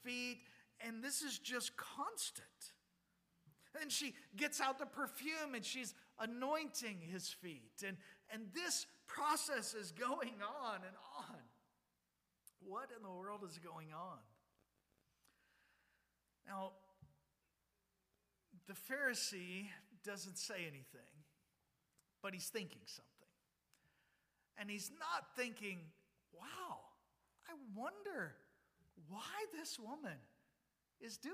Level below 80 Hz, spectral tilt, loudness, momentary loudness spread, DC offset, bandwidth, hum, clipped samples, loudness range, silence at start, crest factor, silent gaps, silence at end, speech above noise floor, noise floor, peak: under -90 dBFS; -2 dB/octave; -46 LUFS; 16 LU; under 0.1%; 15.5 kHz; none; under 0.1%; 13 LU; 0 s; 24 dB; none; 0 s; 40 dB; -87 dBFS; -26 dBFS